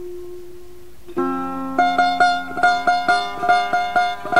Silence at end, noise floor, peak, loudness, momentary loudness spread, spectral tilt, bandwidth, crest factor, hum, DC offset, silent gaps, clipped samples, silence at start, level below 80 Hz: 0 s; -43 dBFS; -4 dBFS; -19 LUFS; 16 LU; -3.5 dB/octave; 15.5 kHz; 16 dB; none; 2%; none; under 0.1%; 0 s; -52 dBFS